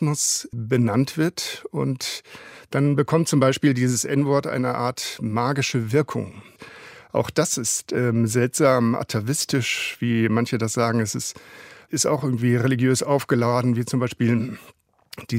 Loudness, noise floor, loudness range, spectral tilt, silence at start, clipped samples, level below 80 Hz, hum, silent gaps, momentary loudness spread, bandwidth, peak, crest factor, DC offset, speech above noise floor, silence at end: -22 LUFS; -44 dBFS; 2 LU; -5 dB/octave; 0 s; under 0.1%; -62 dBFS; none; none; 11 LU; 16 kHz; -4 dBFS; 18 dB; under 0.1%; 22 dB; 0 s